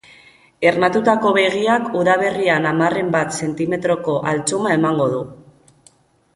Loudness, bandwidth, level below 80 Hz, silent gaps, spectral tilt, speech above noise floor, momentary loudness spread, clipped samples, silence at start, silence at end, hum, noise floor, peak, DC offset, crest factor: -17 LUFS; 11.5 kHz; -58 dBFS; none; -5 dB/octave; 37 dB; 6 LU; under 0.1%; 0.6 s; 1 s; none; -54 dBFS; -2 dBFS; under 0.1%; 16 dB